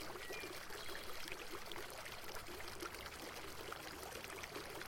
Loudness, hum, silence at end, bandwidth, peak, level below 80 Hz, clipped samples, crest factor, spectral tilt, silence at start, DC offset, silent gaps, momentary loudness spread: -49 LUFS; none; 0 s; 17 kHz; -30 dBFS; -62 dBFS; under 0.1%; 18 dB; -2.5 dB/octave; 0 s; under 0.1%; none; 2 LU